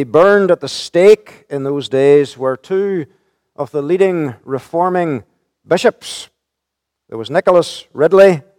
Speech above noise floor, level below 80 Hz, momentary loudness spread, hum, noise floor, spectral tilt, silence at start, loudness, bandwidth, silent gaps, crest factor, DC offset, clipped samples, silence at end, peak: 65 dB; -60 dBFS; 17 LU; none; -78 dBFS; -5.5 dB/octave; 0 s; -14 LUFS; 13 kHz; none; 14 dB; under 0.1%; 0.2%; 0.2 s; 0 dBFS